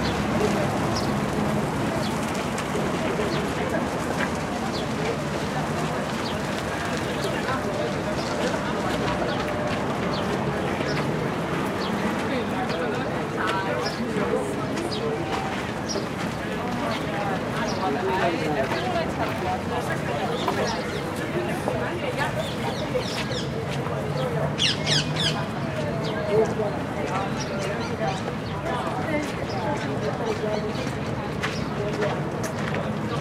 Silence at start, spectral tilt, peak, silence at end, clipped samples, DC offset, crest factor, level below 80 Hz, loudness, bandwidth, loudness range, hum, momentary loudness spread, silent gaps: 0 s; -5 dB/octave; -8 dBFS; 0 s; under 0.1%; under 0.1%; 18 dB; -46 dBFS; -26 LUFS; 16 kHz; 2 LU; none; 4 LU; none